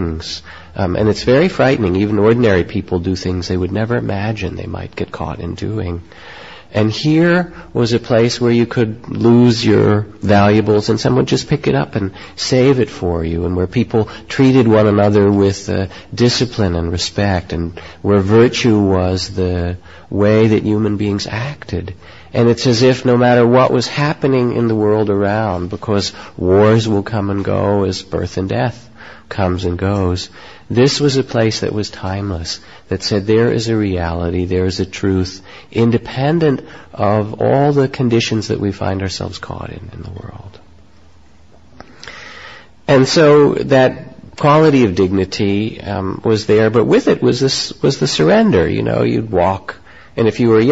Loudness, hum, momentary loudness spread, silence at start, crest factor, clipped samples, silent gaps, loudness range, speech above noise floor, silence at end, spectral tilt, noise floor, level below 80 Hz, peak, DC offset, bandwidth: -15 LUFS; none; 14 LU; 0 s; 14 dB; under 0.1%; none; 6 LU; 33 dB; 0 s; -6 dB/octave; -47 dBFS; -34 dBFS; 0 dBFS; 0.6%; 8 kHz